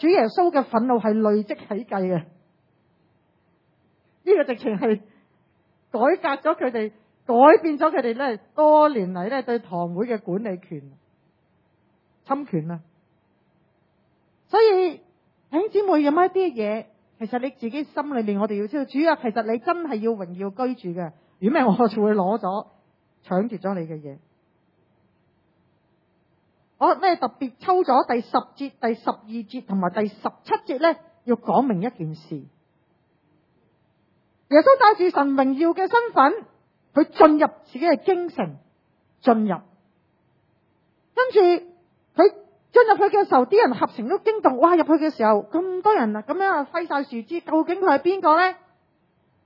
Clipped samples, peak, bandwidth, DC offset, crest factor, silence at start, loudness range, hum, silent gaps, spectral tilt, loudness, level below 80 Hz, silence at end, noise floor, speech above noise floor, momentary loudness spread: under 0.1%; 0 dBFS; 5.8 kHz; under 0.1%; 22 dB; 0 s; 10 LU; none; none; -9 dB/octave; -21 LUFS; -74 dBFS; 0.9 s; -65 dBFS; 45 dB; 14 LU